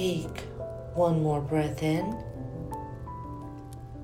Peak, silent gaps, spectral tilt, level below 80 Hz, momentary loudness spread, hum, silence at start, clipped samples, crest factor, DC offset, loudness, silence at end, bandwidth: -14 dBFS; none; -7 dB/octave; -48 dBFS; 14 LU; none; 0 s; under 0.1%; 18 dB; under 0.1%; -31 LUFS; 0 s; 16.5 kHz